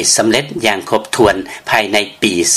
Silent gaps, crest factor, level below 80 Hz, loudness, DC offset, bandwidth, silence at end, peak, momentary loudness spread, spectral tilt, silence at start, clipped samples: none; 14 dB; -44 dBFS; -14 LUFS; under 0.1%; 15.5 kHz; 0 s; 0 dBFS; 5 LU; -2 dB/octave; 0 s; under 0.1%